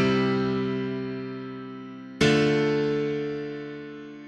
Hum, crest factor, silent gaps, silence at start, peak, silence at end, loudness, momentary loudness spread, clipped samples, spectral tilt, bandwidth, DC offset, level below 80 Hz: none; 18 dB; none; 0 s; -8 dBFS; 0 s; -26 LUFS; 17 LU; under 0.1%; -6 dB/octave; 11.5 kHz; under 0.1%; -54 dBFS